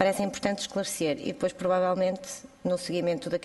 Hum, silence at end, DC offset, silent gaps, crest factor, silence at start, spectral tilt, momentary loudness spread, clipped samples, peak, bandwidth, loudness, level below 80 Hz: none; 0 s; under 0.1%; none; 20 dB; 0 s; -4.5 dB/octave; 5 LU; under 0.1%; -8 dBFS; 12 kHz; -29 LUFS; -62 dBFS